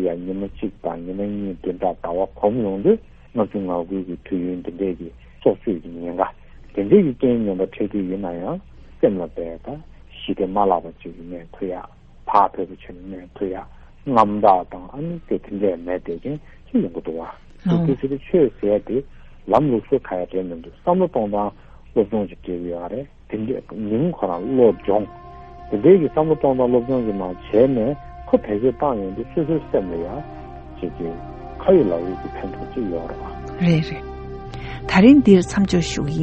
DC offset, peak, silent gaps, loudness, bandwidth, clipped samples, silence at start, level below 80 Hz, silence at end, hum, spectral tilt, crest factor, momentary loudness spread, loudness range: under 0.1%; 0 dBFS; none; -21 LUFS; 8.4 kHz; under 0.1%; 0 s; -42 dBFS; 0 s; none; -7.5 dB/octave; 20 dB; 17 LU; 6 LU